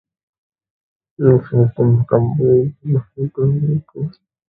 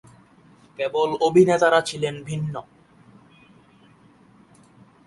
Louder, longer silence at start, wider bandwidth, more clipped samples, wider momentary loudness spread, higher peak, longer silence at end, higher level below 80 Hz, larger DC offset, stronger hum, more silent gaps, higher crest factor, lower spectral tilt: first, -16 LUFS vs -21 LUFS; first, 1.2 s vs 0.8 s; second, 2.1 kHz vs 11.5 kHz; neither; about the same, 11 LU vs 13 LU; first, 0 dBFS vs -4 dBFS; second, 0.4 s vs 2.45 s; first, -48 dBFS vs -62 dBFS; neither; neither; neither; about the same, 16 dB vs 20 dB; first, -14 dB/octave vs -5.5 dB/octave